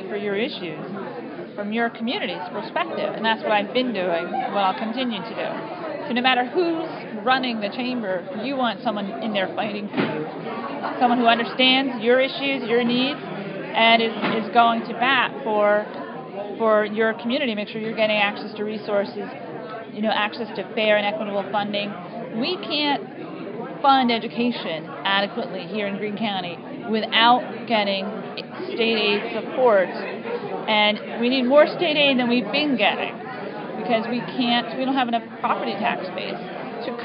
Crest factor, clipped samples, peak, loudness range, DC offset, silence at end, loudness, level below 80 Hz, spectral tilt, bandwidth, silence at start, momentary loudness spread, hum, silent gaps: 20 dB; under 0.1%; -2 dBFS; 5 LU; under 0.1%; 0 s; -22 LUFS; -76 dBFS; -9 dB/octave; 5.4 kHz; 0 s; 13 LU; none; none